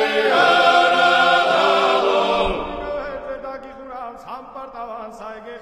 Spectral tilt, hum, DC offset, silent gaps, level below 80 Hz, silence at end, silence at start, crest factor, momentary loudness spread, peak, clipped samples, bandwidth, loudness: -3 dB/octave; none; under 0.1%; none; -42 dBFS; 0 s; 0 s; 16 dB; 20 LU; -2 dBFS; under 0.1%; 13.5 kHz; -16 LUFS